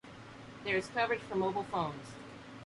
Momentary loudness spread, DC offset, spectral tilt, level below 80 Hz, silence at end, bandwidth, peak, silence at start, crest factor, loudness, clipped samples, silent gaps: 17 LU; under 0.1%; -5.5 dB/octave; -64 dBFS; 0 s; 11.5 kHz; -20 dBFS; 0.05 s; 18 dB; -35 LUFS; under 0.1%; none